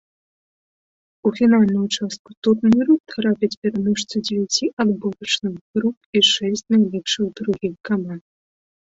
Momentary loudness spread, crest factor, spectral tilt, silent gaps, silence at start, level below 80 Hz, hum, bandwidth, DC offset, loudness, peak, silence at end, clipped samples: 9 LU; 16 dB; -4.5 dB/octave; 2.19-2.25 s, 2.37-2.42 s, 3.00-3.04 s, 3.57-3.62 s, 4.73-4.77 s, 5.61-5.74 s, 5.97-6.13 s; 1.25 s; -58 dBFS; none; 8 kHz; under 0.1%; -20 LUFS; -4 dBFS; 0.65 s; under 0.1%